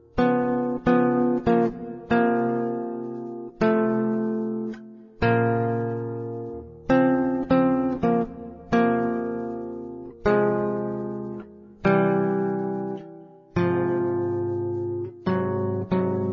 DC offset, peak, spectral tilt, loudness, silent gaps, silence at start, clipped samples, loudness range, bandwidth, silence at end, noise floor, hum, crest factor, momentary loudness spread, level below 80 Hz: under 0.1%; -6 dBFS; -9.5 dB/octave; -24 LUFS; none; 0.15 s; under 0.1%; 3 LU; 6.6 kHz; 0 s; -45 dBFS; none; 18 dB; 13 LU; -50 dBFS